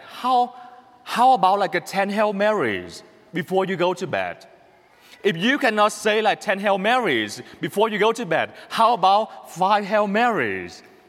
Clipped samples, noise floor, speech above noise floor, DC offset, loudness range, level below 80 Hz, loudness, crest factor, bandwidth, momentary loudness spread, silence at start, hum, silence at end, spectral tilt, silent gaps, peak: under 0.1%; -53 dBFS; 32 dB; under 0.1%; 4 LU; -70 dBFS; -21 LUFS; 16 dB; 16 kHz; 12 LU; 0 s; none; 0.3 s; -4.5 dB/octave; none; -4 dBFS